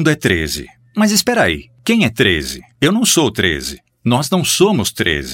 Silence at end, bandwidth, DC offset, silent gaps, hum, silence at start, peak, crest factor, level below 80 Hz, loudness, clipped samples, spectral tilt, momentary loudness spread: 0 s; 17 kHz; under 0.1%; none; none; 0 s; 0 dBFS; 16 dB; -38 dBFS; -15 LUFS; under 0.1%; -3.5 dB/octave; 10 LU